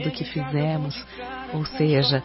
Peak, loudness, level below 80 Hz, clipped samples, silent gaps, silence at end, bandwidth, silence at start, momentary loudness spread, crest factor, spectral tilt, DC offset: -8 dBFS; -25 LUFS; -50 dBFS; under 0.1%; none; 0 s; 5.8 kHz; 0 s; 14 LU; 16 dB; -10 dB/octave; under 0.1%